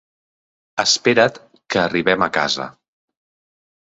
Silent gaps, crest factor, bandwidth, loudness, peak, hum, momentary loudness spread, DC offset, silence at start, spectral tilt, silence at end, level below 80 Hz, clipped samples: none; 20 dB; 8.2 kHz; -17 LUFS; -2 dBFS; none; 10 LU; under 0.1%; 0.75 s; -3 dB/octave; 1.2 s; -58 dBFS; under 0.1%